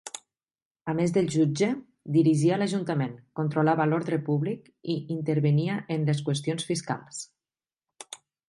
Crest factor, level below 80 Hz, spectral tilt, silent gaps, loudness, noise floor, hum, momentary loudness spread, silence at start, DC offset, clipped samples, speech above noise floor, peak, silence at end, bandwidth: 16 dB; -70 dBFS; -6.5 dB/octave; 0.62-0.75 s; -27 LUFS; under -90 dBFS; none; 16 LU; 0.05 s; under 0.1%; under 0.1%; over 64 dB; -10 dBFS; 0.3 s; 11.5 kHz